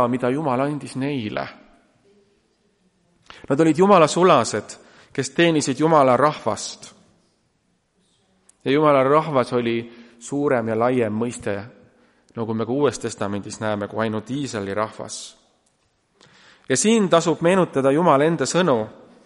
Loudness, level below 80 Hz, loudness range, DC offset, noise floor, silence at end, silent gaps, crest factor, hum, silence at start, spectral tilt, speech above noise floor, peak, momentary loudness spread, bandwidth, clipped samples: -20 LUFS; -62 dBFS; 8 LU; under 0.1%; -67 dBFS; 0.35 s; none; 20 dB; none; 0 s; -5 dB/octave; 47 dB; -2 dBFS; 16 LU; 11.5 kHz; under 0.1%